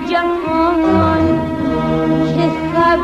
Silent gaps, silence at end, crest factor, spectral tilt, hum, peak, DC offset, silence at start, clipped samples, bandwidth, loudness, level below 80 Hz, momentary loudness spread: none; 0 s; 12 dB; -7.5 dB/octave; none; -2 dBFS; under 0.1%; 0 s; under 0.1%; 8.2 kHz; -15 LUFS; -36 dBFS; 4 LU